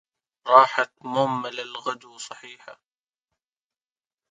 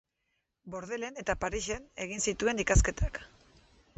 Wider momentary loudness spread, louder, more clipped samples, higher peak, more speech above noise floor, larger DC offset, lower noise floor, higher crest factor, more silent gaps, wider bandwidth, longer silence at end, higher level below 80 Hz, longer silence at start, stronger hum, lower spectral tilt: first, 22 LU vs 13 LU; first, -22 LUFS vs -32 LUFS; neither; first, 0 dBFS vs -12 dBFS; first, over 67 dB vs 49 dB; neither; first, under -90 dBFS vs -81 dBFS; about the same, 24 dB vs 22 dB; neither; first, 9.4 kHz vs 8.4 kHz; first, 1.6 s vs 0.7 s; second, -76 dBFS vs -38 dBFS; second, 0.45 s vs 0.65 s; neither; about the same, -4 dB/octave vs -4 dB/octave